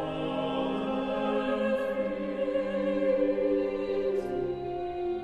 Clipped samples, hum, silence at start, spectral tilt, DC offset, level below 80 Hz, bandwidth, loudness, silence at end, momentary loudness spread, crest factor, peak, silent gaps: under 0.1%; none; 0 s; -7.5 dB/octave; under 0.1%; -54 dBFS; 9 kHz; -30 LUFS; 0 s; 6 LU; 14 dB; -16 dBFS; none